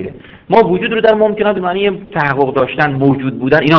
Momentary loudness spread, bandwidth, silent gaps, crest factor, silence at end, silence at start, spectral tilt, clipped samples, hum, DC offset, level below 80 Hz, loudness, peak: 5 LU; 5.4 kHz; none; 12 dB; 0 s; 0 s; -8.5 dB/octave; 0.7%; none; under 0.1%; -44 dBFS; -13 LUFS; 0 dBFS